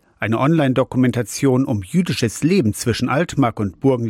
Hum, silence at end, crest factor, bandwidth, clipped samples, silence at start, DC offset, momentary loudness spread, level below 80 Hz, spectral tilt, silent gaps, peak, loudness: none; 0 s; 12 dB; 16 kHz; under 0.1%; 0.2 s; under 0.1%; 3 LU; -48 dBFS; -6 dB/octave; none; -6 dBFS; -18 LUFS